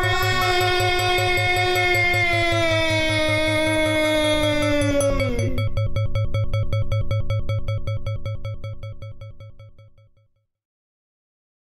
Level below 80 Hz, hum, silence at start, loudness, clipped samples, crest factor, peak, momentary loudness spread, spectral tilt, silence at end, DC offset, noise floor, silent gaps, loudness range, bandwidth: -32 dBFS; none; 0 s; -21 LUFS; under 0.1%; 14 dB; -8 dBFS; 13 LU; -5 dB/octave; 2 s; under 0.1%; -63 dBFS; none; 15 LU; 14.5 kHz